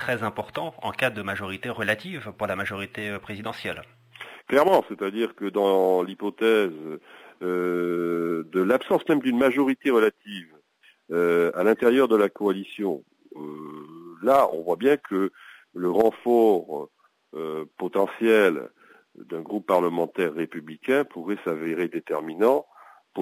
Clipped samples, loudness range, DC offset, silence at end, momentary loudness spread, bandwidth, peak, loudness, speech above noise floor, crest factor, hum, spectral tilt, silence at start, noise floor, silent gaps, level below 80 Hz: under 0.1%; 4 LU; under 0.1%; 0 s; 18 LU; 16 kHz; -8 dBFS; -24 LUFS; 36 dB; 18 dB; none; -6 dB/octave; 0 s; -60 dBFS; none; -64 dBFS